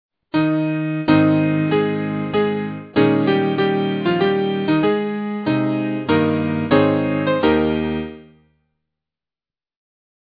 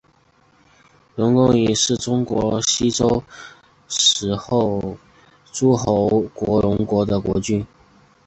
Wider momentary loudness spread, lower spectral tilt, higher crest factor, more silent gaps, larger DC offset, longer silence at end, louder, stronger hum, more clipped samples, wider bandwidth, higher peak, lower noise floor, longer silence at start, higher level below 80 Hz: second, 6 LU vs 14 LU; first, -10 dB/octave vs -4.5 dB/octave; about the same, 18 dB vs 18 dB; neither; neither; first, 2.05 s vs 0.6 s; about the same, -19 LUFS vs -19 LUFS; neither; neither; second, 5 kHz vs 8.4 kHz; about the same, -2 dBFS vs -2 dBFS; first, under -90 dBFS vs -57 dBFS; second, 0.35 s vs 1.15 s; about the same, -48 dBFS vs -44 dBFS